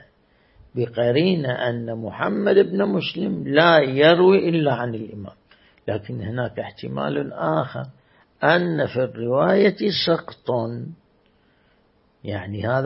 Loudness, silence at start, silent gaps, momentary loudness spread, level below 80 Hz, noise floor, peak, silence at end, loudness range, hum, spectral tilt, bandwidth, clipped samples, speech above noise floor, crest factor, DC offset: -21 LUFS; 0.75 s; none; 17 LU; -60 dBFS; -61 dBFS; -2 dBFS; 0 s; 8 LU; none; -10 dB/octave; 5.8 kHz; under 0.1%; 41 dB; 20 dB; under 0.1%